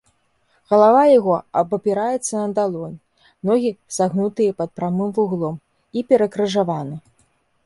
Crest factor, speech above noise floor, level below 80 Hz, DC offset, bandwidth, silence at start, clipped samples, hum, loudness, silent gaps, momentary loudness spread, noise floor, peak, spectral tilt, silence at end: 18 dB; 45 dB; -64 dBFS; under 0.1%; 11.5 kHz; 0.7 s; under 0.1%; none; -19 LUFS; none; 15 LU; -63 dBFS; -2 dBFS; -6 dB/octave; 0.65 s